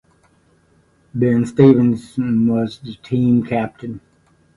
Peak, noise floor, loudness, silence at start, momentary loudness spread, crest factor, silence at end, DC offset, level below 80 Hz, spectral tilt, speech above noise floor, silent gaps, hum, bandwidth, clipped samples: 0 dBFS; -56 dBFS; -17 LUFS; 1.15 s; 20 LU; 18 dB; 0.6 s; under 0.1%; -52 dBFS; -9 dB/octave; 40 dB; none; none; 11 kHz; under 0.1%